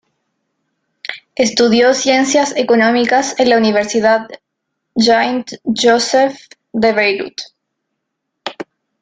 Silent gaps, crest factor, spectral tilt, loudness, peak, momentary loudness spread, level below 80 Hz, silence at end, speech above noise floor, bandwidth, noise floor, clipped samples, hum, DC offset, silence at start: none; 14 dB; -3 dB/octave; -13 LUFS; 0 dBFS; 17 LU; -58 dBFS; 0.4 s; 61 dB; 9.4 kHz; -74 dBFS; under 0.1%; none; under 0.1%; 1.1 s